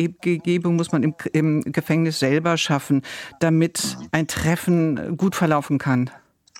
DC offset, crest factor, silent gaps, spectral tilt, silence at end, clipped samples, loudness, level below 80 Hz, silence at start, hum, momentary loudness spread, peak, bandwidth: under 0.1%; 18 dB; none; -5.5 dB/octave; 0.45 s; under 0.1%; -21 LUFS; -52 dBFS; 0 s; none; 4 LU; -2 dBFS; 16 kHz